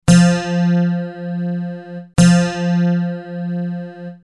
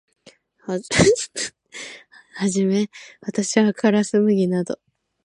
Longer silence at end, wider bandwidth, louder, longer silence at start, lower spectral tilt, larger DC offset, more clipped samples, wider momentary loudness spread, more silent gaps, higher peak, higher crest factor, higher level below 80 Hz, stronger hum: second, 0.15 s vs 0.5 s; about the same, 11.5 kHz vs 11.5 kHz; first, -17 LUFS vs -20 LUFS; second, 0.05 s vs 0.7 s; first, -6.5 dB/octave vs -5 dB/octave; neither; neither; about the same, 16 LU vs 18 LU; neither; about the same, -2 dBFS vs -2 dBFS; about the same, 16 dB vs 20 dB; first, -42 dBFS vs -50 dBFS; neither